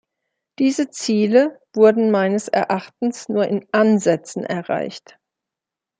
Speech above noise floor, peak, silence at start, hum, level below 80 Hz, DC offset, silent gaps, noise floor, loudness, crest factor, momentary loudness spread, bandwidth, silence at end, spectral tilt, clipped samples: 68 dB; -2 dBFS; 0.6 s; none; -70 dBFS; under 0.1%; none; -86 dBFS; -19 LUFS; 16 dB; 10 LU; 9.4 kHz; 1 s; -5.5 dB/octave; under 0.1%